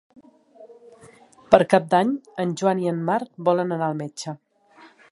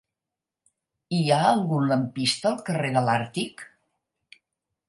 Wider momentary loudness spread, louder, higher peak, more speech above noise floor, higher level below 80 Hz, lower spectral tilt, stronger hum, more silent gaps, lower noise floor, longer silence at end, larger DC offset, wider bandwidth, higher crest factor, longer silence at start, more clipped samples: first, 15 LU vs 10 LU; about the same, -22 LUFS vs -24 LUFS; first, 0 dBFS vs -6 dBFS; second, 31 dB vs 64 dB; first, -60 dBFS vs -68 dBFS; about the same, -6 dB/octave vs -5.5 dB/octave; neither; neither; second, -52 dBFS vs -88 dBFS; second, 0.25 s vs 1.25 s; neither; about the same, 11.5 kHz vs 11.5 kHz; about the same, 24 dB vs 20 dB; second, 0.6 s vs 1.1 s; neither